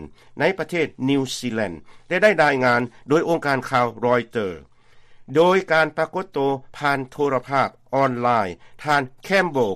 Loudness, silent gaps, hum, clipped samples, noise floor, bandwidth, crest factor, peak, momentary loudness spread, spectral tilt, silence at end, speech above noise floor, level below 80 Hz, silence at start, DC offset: -21 LUFS; none; none; under 0.1%; -47 dBFS; 14.5 kHz; 18 dB; -4 dBFS; 10 LU; -5.5 dB/octave; 0 s; 26 dB; -56 dBFS; 0 s; under 0.1%